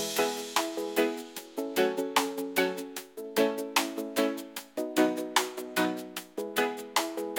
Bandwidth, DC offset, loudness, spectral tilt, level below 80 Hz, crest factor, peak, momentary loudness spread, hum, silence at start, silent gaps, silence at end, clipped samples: 17 kHz; under 0.1%; -30 LUFS; -2.5 dB/octave; -78 dBFS; 22 dB; -8 dBFS; 11 LU; none; 0 s; none; 0 s; under 0.1%